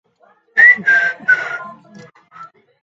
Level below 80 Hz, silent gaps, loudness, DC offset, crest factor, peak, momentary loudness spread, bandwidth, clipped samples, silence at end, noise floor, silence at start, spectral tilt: -72 dBFS; none; -11 LUFS; under 0.1%; 16 dB; 0 dBFS; 16 LU; 7.6 kHz; under 0.1%; 0.4 s; -55 dBFS; 0.55 s; -3 dB/octave